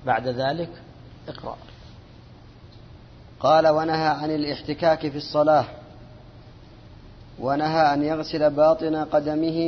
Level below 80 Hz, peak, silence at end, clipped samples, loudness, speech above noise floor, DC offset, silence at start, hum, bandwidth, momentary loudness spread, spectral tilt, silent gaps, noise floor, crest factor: -52 dBFS; -6 dBFS; 0 s; under 0.1%; -22 LUFS; 25 dB; under 0.1%; 0 s; none; 6.4 kHz; 18 LU; -7 dB/octave; none; -46 dBFS; 18 dB